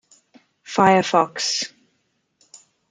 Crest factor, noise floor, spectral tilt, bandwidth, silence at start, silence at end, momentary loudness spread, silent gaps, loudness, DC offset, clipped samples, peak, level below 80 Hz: 20 dB; -70 dBFS; -3.5 dB/octave; 9.6 kHz; 0.7 s; 1.25 s; 11 LU; none; -19 LUFS; under 0.1%; under 0.1%; -2 dBFS; -66 dBFS